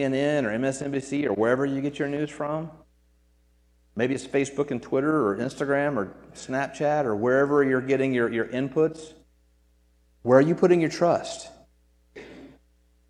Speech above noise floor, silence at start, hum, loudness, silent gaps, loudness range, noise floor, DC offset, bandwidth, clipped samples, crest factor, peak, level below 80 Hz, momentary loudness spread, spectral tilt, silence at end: 38 dB; 0 s; none; -25 LUFS; none; 5 LU; -62 dBFS; under 0.1%; 11 kHz; under 0.1%; 22 dB; -4 dBFS; -60 dBFS; 15 LU; -6.5 dB/octave; 0.6 s